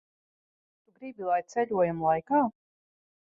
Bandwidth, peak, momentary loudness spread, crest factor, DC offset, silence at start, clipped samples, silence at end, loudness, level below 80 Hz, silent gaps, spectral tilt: 7.6 kHz; -14 dBFS; 14 LU; 18 dB; under 0.1%; 1 s; under 0.1%; 0.75 s; -28 LUFS; -68 dBFS; none; -7.5 dB/octave